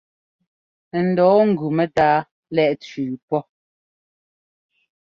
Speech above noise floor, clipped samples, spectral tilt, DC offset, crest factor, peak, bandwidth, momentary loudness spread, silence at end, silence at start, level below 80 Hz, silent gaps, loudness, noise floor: over 72 dB; under 0.1%; -8 dB/octave; under 0.1%; 18 dB; -4 dBFS; 7.4 kHz; 12 LU; 1.6 s; 0.95 s; -60 dBFS; 2.31-2.43 s, 3.22-3.28 s; -19 LUFS; under -90 dBFS